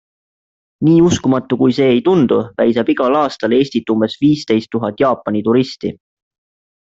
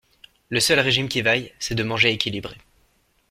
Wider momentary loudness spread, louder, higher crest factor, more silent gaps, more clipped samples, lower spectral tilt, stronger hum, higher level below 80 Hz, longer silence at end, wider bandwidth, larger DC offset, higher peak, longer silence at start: second, 6 LU vs 9 LU; first, -14 LUFS vs -20 LUFS; second, 12 dB vs 22 dB; neither; neither; first, -6.5 dB/octave vs -3 dB/octave; neither; about the same, -52 dBFS vs -52 dBFS; about the same, 0.85 s vs 0.75 s; second, 7.8 kHz vs 16.5 kHz; neither; about the same, -2 dBFS vs -2 dBFS; first, 0.8 s vs 0.5 s